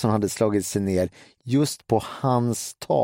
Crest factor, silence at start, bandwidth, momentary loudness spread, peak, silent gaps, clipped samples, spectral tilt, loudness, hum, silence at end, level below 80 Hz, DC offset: 16 dB; 0 s; 16.5 kHz; 5 LU; -6 dBFS; none; under 0.1%; -6 dB/octave; -24 LUFS; none; 0 s; -56 dBFS; under 0.1%